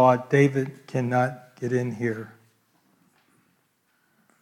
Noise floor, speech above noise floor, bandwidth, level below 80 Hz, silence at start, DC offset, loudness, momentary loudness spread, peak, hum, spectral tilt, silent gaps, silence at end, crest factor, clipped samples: -69 dBFS; 46 dB; 12.5 kHz; -74 dBFS; 0 s; under 0.1%; -25 LUFS; 13 LU; -6 dBFS; none; -7.5 dB/octave; none; 2.15 s; 20 dB; under 0.1%